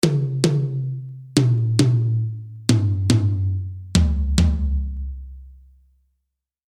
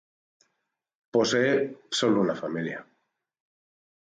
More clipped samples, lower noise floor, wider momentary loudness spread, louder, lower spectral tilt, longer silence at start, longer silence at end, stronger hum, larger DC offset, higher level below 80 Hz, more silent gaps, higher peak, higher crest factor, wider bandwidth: neither; about the same, -78 dBFS vs -81 dBFS; about the same, 11 LU vs 10 LU; first, -21 LUFS vs -26 LUFS; first, -6 dB/octave vs -4.5 dB/octave; second, 0.05 s vs 1.15 s; about the same, 1.25 s vs 1.2 s; neither; neither; first, -28 dBFS vs -72 dBFS; neither; first, -2 dBFS vs -12 dBFS; about the same, 20 dB vs 18 dB; first, 14 kHz vs 9.4 kHz